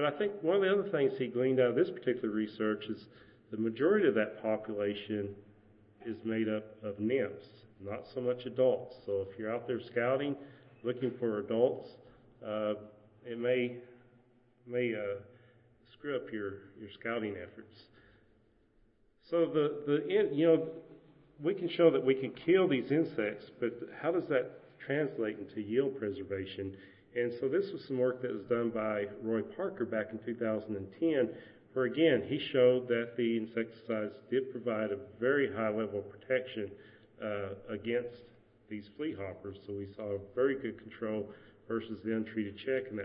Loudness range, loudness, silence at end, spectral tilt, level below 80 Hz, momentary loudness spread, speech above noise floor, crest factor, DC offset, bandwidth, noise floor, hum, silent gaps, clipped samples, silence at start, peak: 8 LU; -34 LUFS; 0 s; -9.5 dB/octave; -74 dBFS; 15 LU; 35 dB; 20 dB; under 0.1%; 5.4 kHz; -68 dBFS; none; none; under 0.1%; 0 s; -14 dBFS